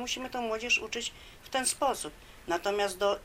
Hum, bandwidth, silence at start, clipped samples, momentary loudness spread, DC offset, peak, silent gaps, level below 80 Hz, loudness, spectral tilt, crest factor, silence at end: none; 16 kHz; 0 s; under 0.1%; 11 LU; under 0.1%; -16 dBFS; none; -56 dBFS; -31 LUFS; -1 dB/octave; 18 dB; 0 s